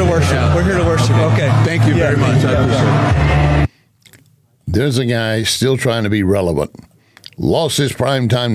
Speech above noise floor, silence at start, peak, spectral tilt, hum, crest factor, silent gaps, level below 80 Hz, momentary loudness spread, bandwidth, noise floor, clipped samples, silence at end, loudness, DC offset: 39 dB; 0 s; -4 dBFS; -6 dB/octave; none; 10 dB; none; -26 dBFS; 5 LU; 14.5 kHz; -53 dBFS; under 0.1%; 0 s; -14 LUFS; under 0.1%